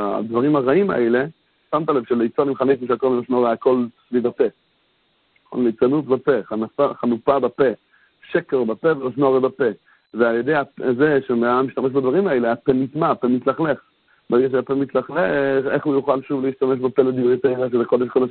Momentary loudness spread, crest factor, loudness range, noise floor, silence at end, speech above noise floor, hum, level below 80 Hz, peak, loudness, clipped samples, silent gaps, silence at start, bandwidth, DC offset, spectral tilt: 5 LU; 18 dB; 2 LU; -64 dBFS; 0 s; 45 dB; none; -60 dBFS; -2 dBFS; -20 LUFS; under 0.1%; none; 0 s; 4.4 kHz; under 0.1%; -12 dB/octave